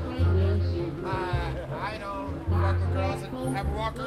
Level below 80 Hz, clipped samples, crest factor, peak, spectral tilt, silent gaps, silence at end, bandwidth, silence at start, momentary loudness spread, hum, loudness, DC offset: -36 dBFS; under 0.1%; 14 dB; -14 dBFS; -7.5 dB/octave; none; 0 s; 11 kHz; 0 s; 8 LU; none; -29 LUFS; under 0.1%